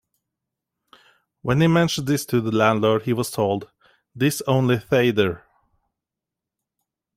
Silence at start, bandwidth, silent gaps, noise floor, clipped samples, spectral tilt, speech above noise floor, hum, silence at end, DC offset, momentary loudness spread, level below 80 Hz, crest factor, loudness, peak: 1.45 s; 16 kHz; none; -86 dBFS; under 0.1%; -6 dB/octave; 66 dB; none; 1.8 s; under 0.1%; 6 LU; -56 dBFS; 18 dB; -21 LUFS; -4 dBFS